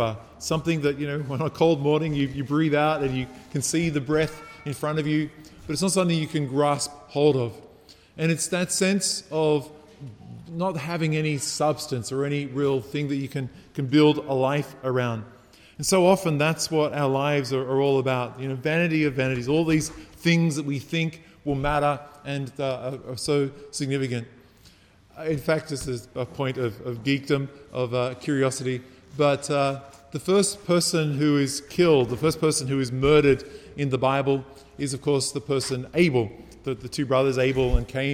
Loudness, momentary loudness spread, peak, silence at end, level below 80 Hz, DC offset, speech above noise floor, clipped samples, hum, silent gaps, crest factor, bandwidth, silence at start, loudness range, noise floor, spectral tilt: -25 LUFS; 11 LU; -6 dBFS; 0 s; -44 dBFS; under 0.1%; 30 dB; under 0.1%; none; none; 18 dB; 17.5 kHz; 0 s; 5 LU; -54 dBFS; -5 dB/octave